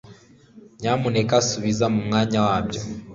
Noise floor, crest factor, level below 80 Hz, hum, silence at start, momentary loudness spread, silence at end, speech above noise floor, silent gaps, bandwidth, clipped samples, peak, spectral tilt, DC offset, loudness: -49 dBFS; 18 dB; -48 dBFS; none; 0.05 s; 8 LU; 0 s; 27 dB; none; 7.8 kHz; under 0.1%; -4 dBFS; -5 dB/octave; under 0.1%; -22 LUFS